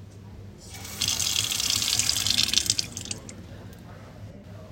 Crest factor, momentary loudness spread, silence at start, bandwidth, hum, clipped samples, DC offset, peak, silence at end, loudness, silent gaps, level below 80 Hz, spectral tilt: 26 dB; 23 LU; 0 s; 17 kHz; none; under 0.1%; under 0.1%; -2 dBFS; 0 s; -23 LUFS; none; -52 dBFS; -0.5 dB/octave